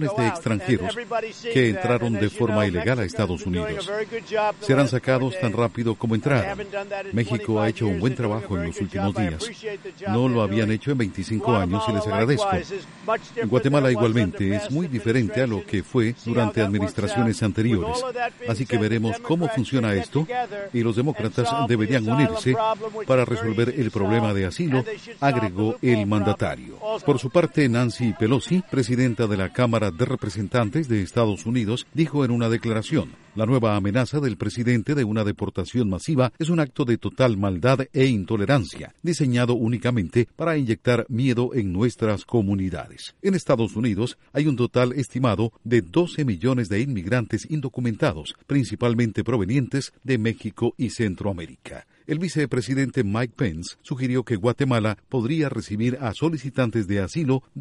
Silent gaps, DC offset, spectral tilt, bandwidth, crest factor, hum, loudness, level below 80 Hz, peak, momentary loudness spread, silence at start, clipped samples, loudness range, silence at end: none; under 0.1%; -7 dB/octave; 11.5 kHz; 18 dB; none; -23 LUFS; -50 dBFS; -4 dBFS; 6 LU; 0 s; under 0.1%; 2 LU; 0 s